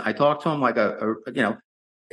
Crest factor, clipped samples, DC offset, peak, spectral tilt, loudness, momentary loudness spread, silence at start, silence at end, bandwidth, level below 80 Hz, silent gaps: 16 dB; under 0.1%; under 0.1%; -8 dBFS; -7 dB/octave; -23 LUFS; 6 LU; 0 s; 0.55 s; 10.5 kHz; -72 dBFS; none